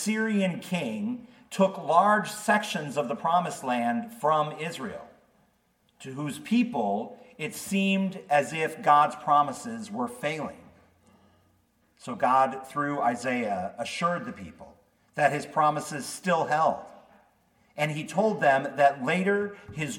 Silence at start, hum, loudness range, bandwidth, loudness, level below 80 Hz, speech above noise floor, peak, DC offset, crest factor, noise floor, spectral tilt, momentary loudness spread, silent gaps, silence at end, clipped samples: 0 s; none; 5 LU; 17 kHz; -27 LUFS; -72 dBFS; 42 dB; -6 dBFS; under 0.1%; 22 dB; -68 dBFS; -5 dB/octave; 14 LU; none; 0 s; under 0.1%